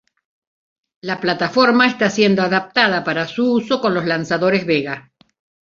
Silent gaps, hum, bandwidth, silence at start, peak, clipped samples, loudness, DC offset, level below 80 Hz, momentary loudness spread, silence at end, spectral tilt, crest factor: none; none; 7.4 kHz; 1.05 s; -2 dBFS; under 0.1%; -17 LUFS; under 0.1%; -60 dBFS; 8 LU; 0.65 s; -5 dB/octave; 16 dB